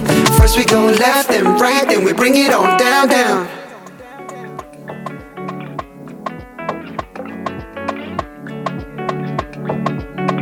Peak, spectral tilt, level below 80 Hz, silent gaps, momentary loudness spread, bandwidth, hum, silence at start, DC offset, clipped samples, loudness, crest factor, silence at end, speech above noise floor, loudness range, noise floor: 0 dBFS; -4.5 dB/octave; -28 dBFS; none; 20 LU; 19 kHz; none; 0 s; under 0.1%; under 0.1%; -14 LUFS; 16 dB; 0 s; 23 dB; 17 LU; -35 dBFS